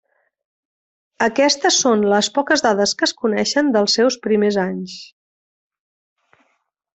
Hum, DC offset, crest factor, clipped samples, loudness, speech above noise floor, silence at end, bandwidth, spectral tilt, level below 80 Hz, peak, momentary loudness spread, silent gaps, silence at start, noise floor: none; under 0.1%; 16 dB; under 0.1%; -17 LUFS; 51 dB; 1.9 s; 8.4 kHz; -3 dB/octave; -62 dBFS; -2 dBFS; 7 LU; none; 1.2 s; -68 dBFS